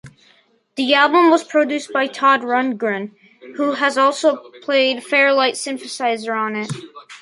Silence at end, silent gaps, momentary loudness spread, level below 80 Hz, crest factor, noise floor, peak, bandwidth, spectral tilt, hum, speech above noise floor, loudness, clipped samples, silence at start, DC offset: 0.05 s; none; 14 LU; -70 dBFS; 16 dB; -56 dBFS; -2 dBFS; 11.5 kHz; -3.5 dB/octave; none; 39 dB; -17 LUFS; under 0.1%; 0.05 s; under 0.1%